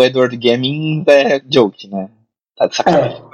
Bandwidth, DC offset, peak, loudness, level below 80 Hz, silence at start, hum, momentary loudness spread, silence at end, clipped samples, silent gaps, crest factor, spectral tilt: 9.4 kHz; under 0.1%; 0 dBFS; -14 LUFS; -58 dBFS; 0 s; none; 15 LU; 0.1 s; under 0.1%; none; 14 dB; -5.5 dB/octave